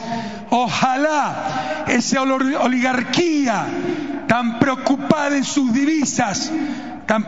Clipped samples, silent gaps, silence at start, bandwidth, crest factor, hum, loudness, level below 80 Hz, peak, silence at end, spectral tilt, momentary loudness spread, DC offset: under 0.1%; none; 0 s; 7.8 kHz; 18 dB; none; -19 LUFS; -56 dBFS; 0 dBFS; 0 s; -4 dB/octave; 7 LU; 0.7%